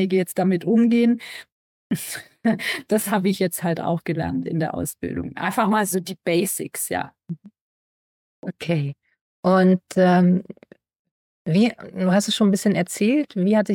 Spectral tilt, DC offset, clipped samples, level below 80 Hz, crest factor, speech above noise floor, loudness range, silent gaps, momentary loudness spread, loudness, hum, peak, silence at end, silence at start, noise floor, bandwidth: -5.5 dB/octave; under 0.1%; under 0.1%; -60 dBFS; 16 dB; over 69 dB; 5 LU; 1.52-1.90 s, 7.61-8.43 s, 9.21-9.43 s, 10.99-11.05 s, 11.11-11.45 s; 14 LU; -21 LUFS; none; -4 dBFS; 0 s; 0 s; under -90 dBFS; 17.5 kHz